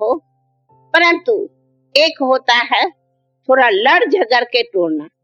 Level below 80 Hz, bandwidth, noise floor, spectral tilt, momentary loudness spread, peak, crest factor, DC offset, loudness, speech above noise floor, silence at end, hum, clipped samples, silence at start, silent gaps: -70 dBFS; 10.5 kHz; -63 dBFS; -2.5 dB/octave; 9 LU; 0 dBFS; 16 dB; under 0.1%; -14 LUFS; 49 dB; 0.15 s; none; under 0.1%; 0 s; none